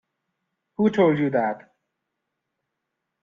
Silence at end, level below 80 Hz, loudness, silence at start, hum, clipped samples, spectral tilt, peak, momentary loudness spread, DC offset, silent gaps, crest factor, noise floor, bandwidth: 1.65 s; -68 dBFS; -22 LUFS; 0.8 s; none; under 0.1%; -8.5 dB/octave; -8 dBFS; 17 LU; under 0.1%; none; 18 dB; -81 dBFS; 7.2 kHz